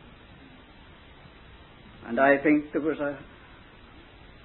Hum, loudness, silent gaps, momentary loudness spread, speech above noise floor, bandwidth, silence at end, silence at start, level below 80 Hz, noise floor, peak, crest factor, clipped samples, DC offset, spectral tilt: none; -25 LUFS; none; 23 LU; 26 dB; 4.2 kHz; 1.2 s; 1.5 s; -56 dBFS; -51 dBFS; -8 dBFS; 22 dB; under 0.1%; under 0.1%; -10 dB/octave